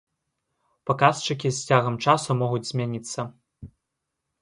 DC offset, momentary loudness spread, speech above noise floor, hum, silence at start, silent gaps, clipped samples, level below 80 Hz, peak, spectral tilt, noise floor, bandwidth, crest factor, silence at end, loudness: under 0.1%; 12 LU; 58 dB; none; 0.85 s; none; under 0.1%; -62 dBFS; -2 dBFS; -5 dB/octave; -82 dBFS; 11.5 kHz; 22 dB; 0.75 s; -24 LUFS